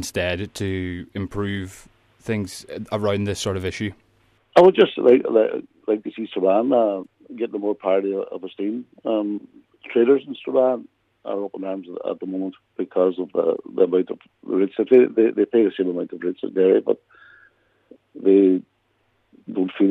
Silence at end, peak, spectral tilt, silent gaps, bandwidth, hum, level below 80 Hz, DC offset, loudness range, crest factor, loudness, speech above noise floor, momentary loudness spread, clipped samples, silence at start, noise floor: 0 s; -2 dBFS; -6.5 dB/octave; none; 13 kHz; none; -58 dBFS; under 0.1%; 7 LU; 18 dB; -21 LUFS; 46 dB; 15 LU; under 0.1%; 0 s; -67 dBFS